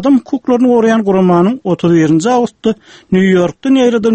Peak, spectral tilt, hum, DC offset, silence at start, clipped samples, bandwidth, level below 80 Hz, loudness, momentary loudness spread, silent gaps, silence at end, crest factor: 0 dBFS; -7 dB/octave; none; under 0.1%; 0 s; under 0.1%; 8.8 kHz; -48 dBFS; -11 LUFS; 6 LU; none; 0 s; 10 dB